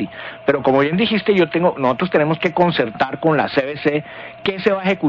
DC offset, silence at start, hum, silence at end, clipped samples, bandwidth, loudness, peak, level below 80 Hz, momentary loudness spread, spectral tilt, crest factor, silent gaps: under 0.1%; 0 s; none; 0 s; under 0.1%; 7.4 kHz; -18 LUFS; -4 dBFS; -54 dBFS; 8 LU; -8 dB/octave; 14 dB; none